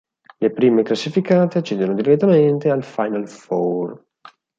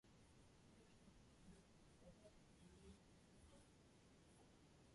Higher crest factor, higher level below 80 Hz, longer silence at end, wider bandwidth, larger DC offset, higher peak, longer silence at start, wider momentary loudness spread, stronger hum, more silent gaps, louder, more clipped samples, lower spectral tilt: about the same, 16 dB vs 16 dB; first, -66 dBFS vs -76 dBFS; first, 0.6 s vs 0 s; second, 7.8 kHz vs 11.5 kHz; neither; first, -2 dBFS vs -52 dBFS; first, 0.4 s vs 0.05 s; first, 10 LU vs 2 LU; neither; neither; first, -18 LUFS vs -69 LUFS; neither; first, -7.5 dB/octave vs -5 dB/octave